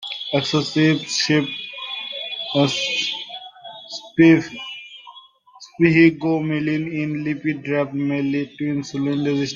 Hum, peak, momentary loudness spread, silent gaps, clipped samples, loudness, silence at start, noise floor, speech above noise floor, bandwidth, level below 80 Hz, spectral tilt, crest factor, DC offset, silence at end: none; -2 dBFS; 19 LU; none; under 0.1%; -20 LUFS; 0 s; -47 dBFS; 28 dB; 9.4 kHz; -62 dBFS; -5 dB/octave; 20 dB; under 0.1%; 0 s